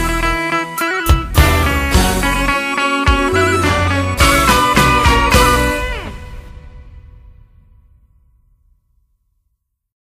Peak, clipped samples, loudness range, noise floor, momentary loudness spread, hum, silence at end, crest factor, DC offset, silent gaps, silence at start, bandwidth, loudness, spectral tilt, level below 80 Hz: 0 dBFS; under 0.1%; 7 LU; -69 dBFS; 7 LU; none; 2.85 s; 16 dB; under 0.1%; none; 0 s; 15.5 kHz; -13 LUFS; -4 dB/octave; -22 dBFS